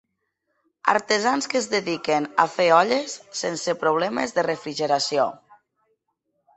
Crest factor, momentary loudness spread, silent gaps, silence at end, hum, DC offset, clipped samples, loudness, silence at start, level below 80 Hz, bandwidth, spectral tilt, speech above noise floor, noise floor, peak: 22 dB; 9 LU; none; 1.2 s; none; under 0.1%; under 0.1%; -22 LUFS; 0.85 s; -70 dBFS; 8.4 kHz; -3 dB/octave; 53 dB; -76 dBFS; 0 dBFS